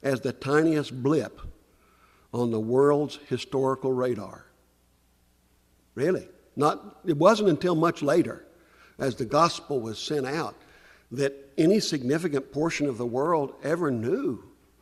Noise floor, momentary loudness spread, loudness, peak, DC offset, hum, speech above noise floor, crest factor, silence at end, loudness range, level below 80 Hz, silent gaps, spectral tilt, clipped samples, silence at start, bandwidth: -64 dBFS; 11 LU; -26 LUFS; -6 dBFS; under 0.1%; 60 Hz at -60 dBFS; 39 dB; 20 dB; 0.35 s; 6 LU; -58 dBFS; none; -6 dB/octave; under 0.1%; 0.05 s; 14.5 kHz